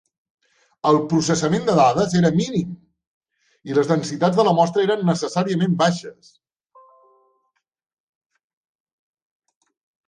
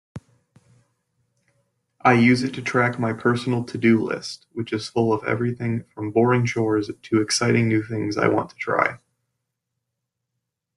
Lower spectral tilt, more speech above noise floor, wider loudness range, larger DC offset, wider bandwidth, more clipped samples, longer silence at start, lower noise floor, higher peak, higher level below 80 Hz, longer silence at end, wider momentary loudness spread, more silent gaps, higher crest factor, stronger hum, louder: about the same, -6 dB/octave vs -5.5 dB/octave; second, 54 dB vs 60 dB; first, 6 LU vs 2 LU; neither; second, 10 kHz vs 12 kHz; neither; first, 0.85 s vs 0.15 s; second, -72 dBFS vs -81 dBFS; about the same, -2 dBFS vs -4 dBFS; about the same, -60 dBFS vs -60 dBFS; first, 3.95 s vs 1.8 s; about the same, 9 LU vs 9 LU; first, 3.07-3.21 s vs none; about the same, 20 dB vs 20 dB; neither; first, -19 LUFS vs -22 LUFS